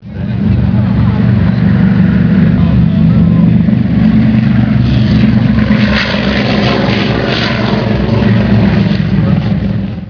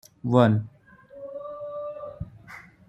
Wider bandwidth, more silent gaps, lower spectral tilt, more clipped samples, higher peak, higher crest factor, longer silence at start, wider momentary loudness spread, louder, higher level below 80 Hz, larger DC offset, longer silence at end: second, 5.4 kHz vs 12 kHz; neither; about the same, -8.5 dB/octave vs -8.5 dB/octave; neither; first, 0 dBFS vs -4 dBFS; second, 8 dB vs 24 dB; second, 0 s vs 0.25 s; second, 4 LU vs 23 LU; first, -10 LUFS vs -25 LUFS; first, -22 dBFS vs -56 dBFS; first, 0.1% vs under 0.1%; second, 0 s vs 0.25 s